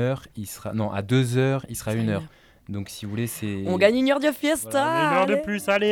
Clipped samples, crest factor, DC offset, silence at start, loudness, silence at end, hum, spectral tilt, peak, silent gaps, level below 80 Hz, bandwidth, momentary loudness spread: under 0.1%; 20 dB; under 0.1%; 0 s; -24 LUFS; 0 s; none; -5.5 dB/octave; -4 dBFS; none; -56 dBFS; 18.5 kHz; 12 LU